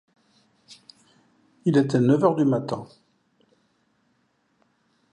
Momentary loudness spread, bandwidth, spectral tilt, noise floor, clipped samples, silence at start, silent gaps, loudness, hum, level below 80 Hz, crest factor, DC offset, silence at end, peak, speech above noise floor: 12 LU; 10 kHz; -8 dB/octave; -69 dBFS; under 0.1%; 1.65 s; none; -22 LUFS; none; -70 dBFS; 20 dB; under 0.1%; 2.3 s; -6 dBFS; 48 dB